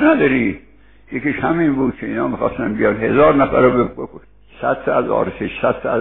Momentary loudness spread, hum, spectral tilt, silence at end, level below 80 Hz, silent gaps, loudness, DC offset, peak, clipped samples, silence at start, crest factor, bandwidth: 10 LU; none; -6 dB/octave; 0 s; -42 dBFS; none; -17 LUFS; 0.4%; -2 dBFS; under 0.1%; 0 s; 16 dB; 4.1 kHz